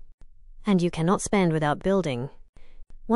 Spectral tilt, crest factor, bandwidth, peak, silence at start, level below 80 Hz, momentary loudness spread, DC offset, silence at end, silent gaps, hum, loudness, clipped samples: -6 dB/octave; 16 dB; 11.5 kHz; -10 dBFS; 0 s; -46 dBFS; 11 LU; under 0.1%; 0 s; 0.14-0.18 s, 2.49-2.53 s; none; -25 LUFS; under 0.1%